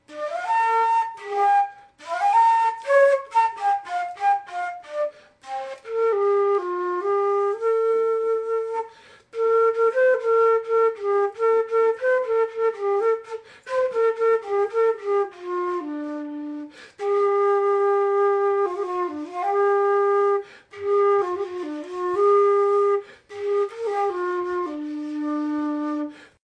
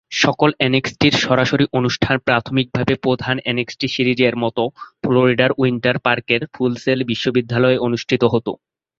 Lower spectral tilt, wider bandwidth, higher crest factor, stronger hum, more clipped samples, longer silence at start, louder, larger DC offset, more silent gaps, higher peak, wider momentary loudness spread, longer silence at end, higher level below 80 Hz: second, -4 dB/octave vs -5.5 dB/octave; first, 9.6 kHz vs 7.6 kHz; about the same, 14 dB vs 16 dB; neither; neither; about the same, 0.1 s vs 0.1 s; second, -22 LUFS vs -17 LUFS; neither; neither; second, -8 dBFS vs -2 dBFS; first, 12 LU vs 6 LU; second, 0.25 s vs 0.45 s; second, -74 dBFS vs -50 dBFS